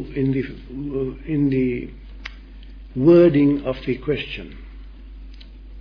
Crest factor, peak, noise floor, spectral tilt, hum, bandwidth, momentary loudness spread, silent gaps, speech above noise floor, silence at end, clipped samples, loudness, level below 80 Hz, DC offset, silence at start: 18 dB; -4 dBFS; -39 dBFS; -10 dB/octave; none; 5.4 kHz; 24 LU; none; 19 dB; 0 s; under 0.1%; -20 LUFS; -38 dBFS; under 0.1%; 0 s